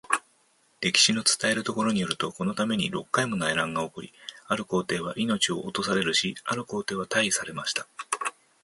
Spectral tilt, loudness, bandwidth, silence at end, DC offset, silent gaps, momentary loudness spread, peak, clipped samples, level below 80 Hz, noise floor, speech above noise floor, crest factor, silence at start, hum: -2.5 dB/octave; -26 LUFS; 12 kHz; 0.3 s; under 0.1%; none; 9 LU; -6 dBFS; under 0.1%; -64 dBFS; -65 dBFS; 38 dB; 22 dB; 0.1 s; none